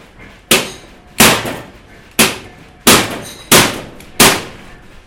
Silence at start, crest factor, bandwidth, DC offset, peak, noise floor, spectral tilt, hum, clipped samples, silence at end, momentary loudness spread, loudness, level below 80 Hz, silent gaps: 0.2 s; 14 dB; over 20 kHz; under 0.1%; 0 dBFS; -39 dBFS; -2 dB/octave; none; 0.6%; 0.3 s; 19 LU; -11 LUFS; -38 dBFS; none